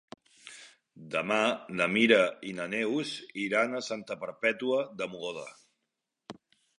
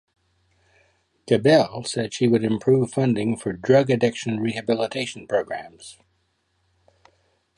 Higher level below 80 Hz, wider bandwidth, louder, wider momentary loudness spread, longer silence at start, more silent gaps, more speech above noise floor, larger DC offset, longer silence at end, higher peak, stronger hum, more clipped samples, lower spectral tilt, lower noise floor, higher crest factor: second, -76 dBFS vs -60 dBFS; about the same, 11 kHz vs 11.5 kHz; second, -29 LUFS vs -22 LUFS; first, 24 LU vs 12 LU; second, 0.45 s vs 1.25 s; neither; first, 55 dB vs 48 dB; neither; second, 0.45 s vs 1.65 s; second, -8 dBFS vs -4 dBFS; neither; neither; second, -4 dB/octave vs -6 dB/octave; first, -85 dBFS vs -69 dBFS; about the same, 24 dB vs 20 dB